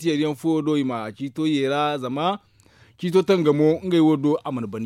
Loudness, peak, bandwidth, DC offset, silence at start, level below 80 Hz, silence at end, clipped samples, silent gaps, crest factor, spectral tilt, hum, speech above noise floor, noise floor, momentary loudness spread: -22 LUFS; -6 dBFS; 13 kHz; under 0.1%; 0 s; -66 dBFS; 0 s; under 0.1%; none; 14 dB; -7 dB/octave; none; 33 dB; -54 dBFS; 11 LU